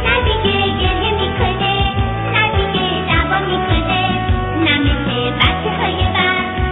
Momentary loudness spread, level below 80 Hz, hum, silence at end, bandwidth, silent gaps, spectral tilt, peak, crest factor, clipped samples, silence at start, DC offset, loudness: 3 LU; -24 dBFS; none; 0 s; 4.1 kHz; none; -9 dB/octave; 0 dBFS; 16 dB; under 0.1%; 0 s; under 0.1%; -15 LUFS